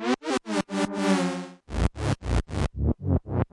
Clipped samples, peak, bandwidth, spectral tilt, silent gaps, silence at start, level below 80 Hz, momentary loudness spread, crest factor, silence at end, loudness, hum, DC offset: under 0.1%; -10 dBFS; 11.5 kHz; -6 dB/octave; none; 0 s; -34 dBFS; 6 LU; 18 dB; 0.1 s; -28 LUFS; none; under 0.1%